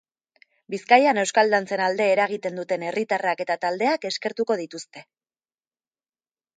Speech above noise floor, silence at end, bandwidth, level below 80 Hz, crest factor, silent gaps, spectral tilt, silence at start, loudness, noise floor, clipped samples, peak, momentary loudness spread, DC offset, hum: over 67 dB; 1.55 s; 9.6 kHz; -78 dBFS; 22 dB; none; -3.5 dB/octave; 0.7 s; -22 LUFS; under -90 dBFS; under 0.1%; -2 dBFS; 15 LU; under 0.1%; none